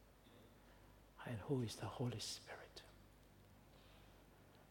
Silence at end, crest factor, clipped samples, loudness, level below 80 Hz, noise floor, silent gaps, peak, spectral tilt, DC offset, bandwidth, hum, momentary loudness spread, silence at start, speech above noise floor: 0 s; 20 dB; under 0.1%; -48 LUFS; -72 dBFS; -66 dBFS; none; -30 dBFS; -5 dB/octave; under 0.1%; 19 kHz; none; 23 LU; 0 s; 21 dB